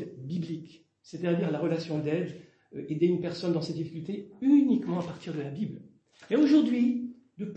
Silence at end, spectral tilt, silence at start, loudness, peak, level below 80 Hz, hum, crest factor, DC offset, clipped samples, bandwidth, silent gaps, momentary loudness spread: 0 s; -8 dB/octave; 0 s; -29 LUFS; -12 dBFS; -74 dBFS; none; 16 dB; under 0.1%; under 0.1%; 8.2 kHz; none; 18 LU